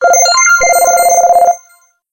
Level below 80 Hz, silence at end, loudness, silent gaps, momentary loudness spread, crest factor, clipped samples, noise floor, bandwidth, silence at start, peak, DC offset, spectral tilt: -46 dBFS; 0.55 s; -7 LUFS; none; 5 LU; 8 dB; under 0.1%; -48 dBFS; 17 kHz; 0 s; 0 dBFS; under 0.1%; 2 dB/octave